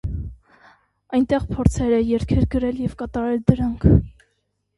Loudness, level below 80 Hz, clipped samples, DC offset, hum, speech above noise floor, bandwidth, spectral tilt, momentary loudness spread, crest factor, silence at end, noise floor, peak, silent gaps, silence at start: -20 LUFS; -30 dBFS; under 0.1%; under 0.1%; none; 52 dB; 11.5 kHz; -8.5 dB/octave; 11 LU; 20 dB; 0.7 s; -71 dBFS; 0 dBFS; none; 0.05 s